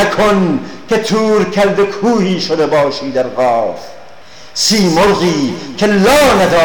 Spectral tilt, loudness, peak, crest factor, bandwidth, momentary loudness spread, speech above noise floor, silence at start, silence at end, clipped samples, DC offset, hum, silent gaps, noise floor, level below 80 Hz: -4.5 dB/octave; -12 LUFS; -4 dBFS; 8 dB; 19 kHz; 8 LU; 26 dB; 0 s; 0 s; under 0.1%; 2%; none; none; -37 dBFS; -38 dBFS